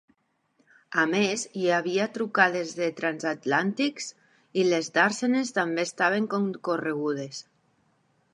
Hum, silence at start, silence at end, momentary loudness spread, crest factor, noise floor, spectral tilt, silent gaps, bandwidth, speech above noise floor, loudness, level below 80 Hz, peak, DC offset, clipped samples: none; 0.9 s; 0.9 s; 8 LU; 24 dB; -70 dBFS; -4 dB/octave; none; 11.5 kHz; 44 dB; -26 LUFS; -80 dBFS; -4 dBFS; under 0.1%; under 0.1%